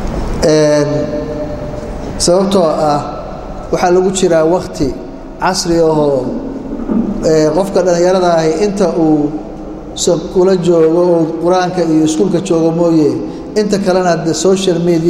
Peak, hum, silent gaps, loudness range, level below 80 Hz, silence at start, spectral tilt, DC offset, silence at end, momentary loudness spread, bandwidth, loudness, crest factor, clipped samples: 0 dBFS; none; none; 2 LU; -30 dBFS; 0 s; -5.5 dB/octave; under 0.1%; 0 s; 12 LU; 14 kHz; -12 LUFS; 12 dB; under 0.1%